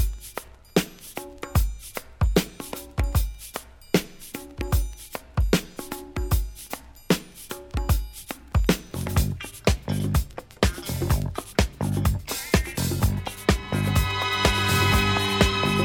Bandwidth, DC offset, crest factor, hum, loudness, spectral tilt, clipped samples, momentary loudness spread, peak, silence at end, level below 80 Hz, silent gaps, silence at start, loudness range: 19 kHz; under 0.1%; 20 dB; none; -25 LUFS; -5 dB/octave; under 0.1%; 16 LU; -6 dBFS; 0 s; -30 dBFS; none; 0 s; 6 LU